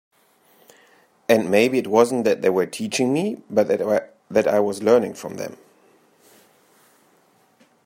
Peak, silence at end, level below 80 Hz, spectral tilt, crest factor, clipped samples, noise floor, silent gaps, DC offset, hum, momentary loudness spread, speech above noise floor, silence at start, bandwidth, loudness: -2 dBFS; 2.3 s; -68 dBFS; -5 dB/octave; 20 dB; under 0.1%; -59 dBFS; none; under 0.1%; none; 13 LU; 40 dB; 1.3 s; 16 kHz; -20 LUFS